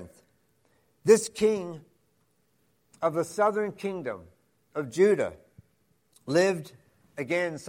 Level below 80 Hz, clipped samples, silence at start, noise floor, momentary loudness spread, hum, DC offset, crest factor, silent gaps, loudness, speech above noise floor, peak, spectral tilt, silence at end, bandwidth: -68 dBFS; under 0.1%; 0 s; -71 dBFS; 19 LU; none; under 0.1%; 22 dB; none; -27 LUFS; 45 dB; -6 dBFS; -5 dB/octave; 0 s; 16 kHz